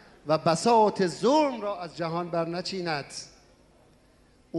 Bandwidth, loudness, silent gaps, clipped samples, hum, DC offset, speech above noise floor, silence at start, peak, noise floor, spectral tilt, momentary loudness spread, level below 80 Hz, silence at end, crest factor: 11.5 kHz; -26 LUFS; none; under 0.1%; none; under 0.1%; 34 dB; 0.25 s; -10 dBFS; -60 dBFS; -5 dB/octave; 12 LU; -66 dBFS; 0 s; 18 dB